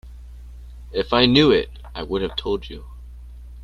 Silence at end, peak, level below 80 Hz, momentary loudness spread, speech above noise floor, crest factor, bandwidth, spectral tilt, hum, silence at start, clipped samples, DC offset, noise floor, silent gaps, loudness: 0 s; -2 dBFS; -38 dBFS; 27 LU; 19 dB; 22 dB; 11 kHz; -6.5 dB/octave; 60 Hz at -35 dBFS; 0.05 s; under 0.1%; under 0.1%; -38 dBFS; none; -19 LUFS